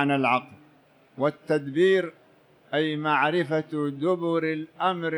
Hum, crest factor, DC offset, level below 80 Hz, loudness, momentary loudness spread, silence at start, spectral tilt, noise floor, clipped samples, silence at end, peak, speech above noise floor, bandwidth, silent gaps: none; 18 dB; under 0.1%; -76 dBFS; -25 LUFS; 7 LU; 0 s; -7 dB/octave; -58 dBFS; under 0.1%; 0 s; -8 dBFS; 33 dB; 11 kHz; none